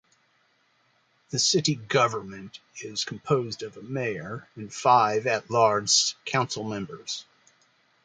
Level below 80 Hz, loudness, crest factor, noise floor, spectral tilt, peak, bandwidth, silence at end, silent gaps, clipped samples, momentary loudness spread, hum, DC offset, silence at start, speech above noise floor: -68 dBFS; -25 LUFS; 20 dB; -67 dBFS; -3 dB/octave; -6 dBFS; 10 kHz; 0.85 s; none; under 0.1%; 18 LU; none; under 0.1%; 1.3 s; 41 dB